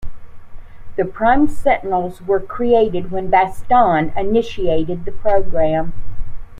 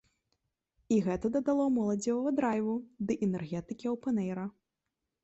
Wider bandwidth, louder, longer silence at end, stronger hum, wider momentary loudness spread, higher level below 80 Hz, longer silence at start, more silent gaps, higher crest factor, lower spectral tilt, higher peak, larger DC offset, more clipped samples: about the same, 9.2 kHz vs 8.4 kHz; first, -17 LUFS vs -32 LUFS; second, 0 s vs 0.75 s; neither; about the same, 10 LU vs 8 LU; first, -30 dBFS vs -64 dBFS; second, 0 s vs 0.9 s; neither; about the same, 14 dB vs 14 dB; about the same, -7.5 dB/octave vs -7 dB/octave; first, -2 dBFS vs -18 dBFS; neither; neither